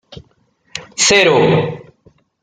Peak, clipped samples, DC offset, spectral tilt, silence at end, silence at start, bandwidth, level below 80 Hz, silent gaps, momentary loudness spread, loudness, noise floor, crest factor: 0 dBFS; under 0.1%; under 0.1%; -3 dB/octave; 0.6 s; 0.1 s; 10 kHz; -50 dBFS; none; 21 LU; -12 LUFS; -57 dBFS; 16 dB